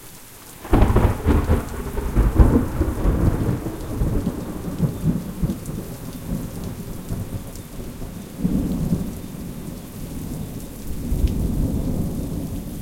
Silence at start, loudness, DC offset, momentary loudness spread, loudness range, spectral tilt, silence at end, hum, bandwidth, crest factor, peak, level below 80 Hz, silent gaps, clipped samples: 0 s; -24 LUFS; under 0.1%; 15 LU; 8 LU; -7.5 dB/octave; 0 s; none; 17 kHz; 22 dB; 0 dBFS; -26 dBFS; none; under 0.1%